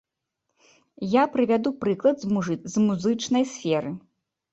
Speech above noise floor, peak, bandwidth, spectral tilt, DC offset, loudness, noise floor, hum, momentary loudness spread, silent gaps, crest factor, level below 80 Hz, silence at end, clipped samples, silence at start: 57 dB; -6 dBFS; 8.2 kHz; -6 dB/octave; under 0.1%; -24 LUFS; -81 dBFS; none; 6 LU; none; 18 dB; -64 dBFS; 0.55 s; under 0.1%; 1 s